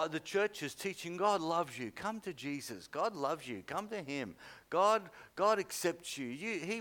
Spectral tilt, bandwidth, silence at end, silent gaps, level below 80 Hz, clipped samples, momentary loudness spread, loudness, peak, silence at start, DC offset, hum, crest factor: -4 dB/octave; 19 kHz; 0 s; none; -76 dBFS; under 0.1%; 10 LU; -36 LUFS; -18 dBFS; 0 s; under 0.1%; none; 18 dB